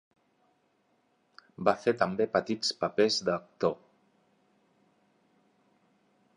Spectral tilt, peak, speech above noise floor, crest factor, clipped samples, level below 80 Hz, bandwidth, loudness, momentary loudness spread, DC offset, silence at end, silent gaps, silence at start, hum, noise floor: -4 dB/octave; -10 dBFS; 43 dB; 24 dB; under 0.1%; -70 dBFS; 11 kHz; -29 LUFS; 6 LU; under 0.1%; 2.6 s; none; 1.6 s; none; -72 dBFS